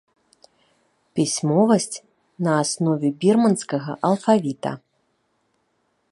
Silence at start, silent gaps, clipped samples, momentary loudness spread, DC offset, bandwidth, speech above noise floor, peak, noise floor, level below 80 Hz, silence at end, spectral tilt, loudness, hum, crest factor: 1.15 s; none; under 0.1%; 13 LU; under 0.1%; 11.5 kHz; 49 dB; -4 dBFS; -69 dBFS; -70 dBFS; 1.35 s; -5.5 dB/octave; -21 LUFS; none; 20 dB